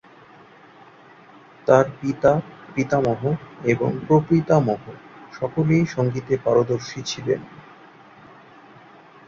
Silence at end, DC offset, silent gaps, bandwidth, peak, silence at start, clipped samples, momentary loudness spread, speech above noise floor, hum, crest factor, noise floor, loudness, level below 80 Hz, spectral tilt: 1.75 s; under 0.1%; none; 7.6 kHz; -2 dBFS; 1.65 s; under 0.1%; 12 LU; 28 dB; none; 22 dB; -48 dBFS; -21 LUFS; -56 dBFS; -7 dB/octave